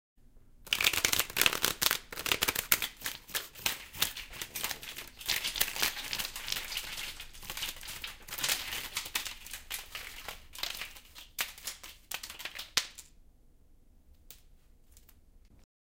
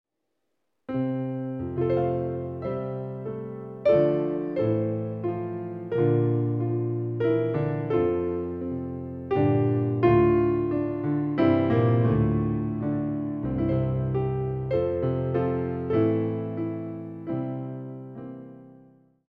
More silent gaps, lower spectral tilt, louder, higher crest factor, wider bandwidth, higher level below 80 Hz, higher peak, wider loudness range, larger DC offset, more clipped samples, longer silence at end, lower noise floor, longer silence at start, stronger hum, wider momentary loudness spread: neither; second, 0.5 dB/octave vs -11.5 dB/octave; second, -33 LUFS vs -26 LUFS; first, 32 dB vs 18 dB; first, 17 kHz vs 4.7 kHz; second, -56 dBFS vs -48 dBFS; first, -4 dBFS vs -8 dBFS; first, 11 LU vs 6 LU; neither; neither; second, 0.25 s vs 0.55 s; second, -60 dBFS vs -79 dBFS; second, 0.35 s vs 0.9 s; neither; about the same, 15 LU vs 13 LU